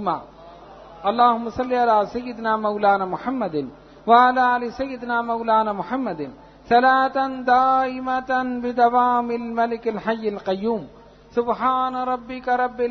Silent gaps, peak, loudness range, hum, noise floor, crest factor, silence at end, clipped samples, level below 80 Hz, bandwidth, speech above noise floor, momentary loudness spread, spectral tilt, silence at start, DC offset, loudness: none; -2 dBFS; 3 LU; none; -43 dBFS; 18 dB; 0 s; under 0.1%; -54 dBFS; 6.4 kHz; 22 dB; 10 LU; -6.5 dB/octave; 0 s; under 0.1%; -21 LUFS